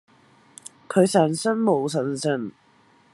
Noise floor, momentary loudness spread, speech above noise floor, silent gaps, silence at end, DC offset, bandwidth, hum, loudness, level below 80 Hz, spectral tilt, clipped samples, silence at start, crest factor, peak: -58 dBFS; 23 LU; 37 dB; none; 0.65 s; under 0.1%; 12.5 kHz; none; -22 LUFS; -72 dBFS; -5.5 dB/octave; under 0.1%; 0.9 s; 20 dB; -4 dBFS